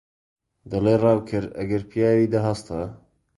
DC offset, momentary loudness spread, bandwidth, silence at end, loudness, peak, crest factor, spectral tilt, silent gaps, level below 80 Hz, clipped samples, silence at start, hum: under 0.1%; 12 LU; 11.5 kHz; 0.4 s; -23 LUFS; -6 dBFS; 18 dB; -8 dB/octave; none; -50 dBFS; under 0.1%; 0.65 s; none